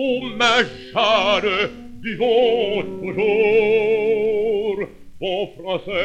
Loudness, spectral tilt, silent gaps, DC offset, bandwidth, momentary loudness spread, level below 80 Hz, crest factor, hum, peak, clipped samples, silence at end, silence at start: -19 LUFS; -4 dB/octave; none; under 0.1%; 9 kHz; 11 LU; -48 dBFS; 14 dB; none; -6 dBFS; under 0.1%; 0 s; 0 s